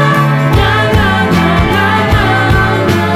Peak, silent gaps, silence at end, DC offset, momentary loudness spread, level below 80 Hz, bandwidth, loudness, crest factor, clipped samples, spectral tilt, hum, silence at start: 0 dBFS; none; 0 s; under 0.1%; 1 LU; -22 dBFS; 15.5 kHz; -10 LUFS; 10 dB; under 0.1%; -6.5 dB/octave; none; 0 s